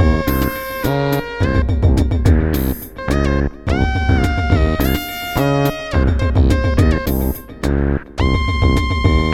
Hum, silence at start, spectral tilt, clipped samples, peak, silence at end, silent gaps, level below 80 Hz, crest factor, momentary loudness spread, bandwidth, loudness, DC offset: none; 0 s; -7 dB/octave; under 0.1%; 0 dBFS; 0 s; none; -20 dBFS; 14 dB; 6 LU; 17 kHz; -17 LUFS; under 0.1%